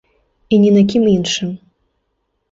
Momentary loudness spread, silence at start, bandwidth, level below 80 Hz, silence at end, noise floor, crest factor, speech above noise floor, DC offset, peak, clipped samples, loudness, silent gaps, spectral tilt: 13 LU; 0.5 s; 7.8 kHz; -50 dBFS; 0.95 s; -69 dBFS; 14 dB; 56 dB; under 0.1%; -2 dBFS; under 0.1%; -14 LUFS; none; -6 dB/octave